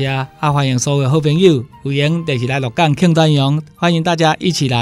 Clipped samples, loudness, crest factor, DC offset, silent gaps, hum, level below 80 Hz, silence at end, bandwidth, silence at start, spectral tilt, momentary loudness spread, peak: under 0.1%; -15 LUFS; 14 dB; under 0.1%; none; none; -48 dBFS; 0 s; 12.5 kHz; 0 s; -5.5 dB/octave; 6 LU; 0 dBFS